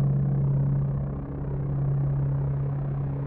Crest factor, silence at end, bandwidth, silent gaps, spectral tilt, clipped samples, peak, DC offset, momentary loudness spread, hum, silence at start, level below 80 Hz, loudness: 10 dB; 0 s; 2.3 kHz; none; -12.5 dB/octave; under 0.1%; -16 dBFS; under 0.1%; 6 LU; none; 0 s; -40 dBFS; -27 LUFS